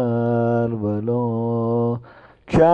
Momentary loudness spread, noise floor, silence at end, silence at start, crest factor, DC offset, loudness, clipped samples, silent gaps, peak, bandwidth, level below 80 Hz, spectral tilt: 4 LU; -45 dBFS; 0 s; 0 s; 14 dB; under 0.1%; -21 LUFS; under 0.1%; none; -4 dBFS; 8.4 kHz; -44 dBFS; -9.5 dB/octave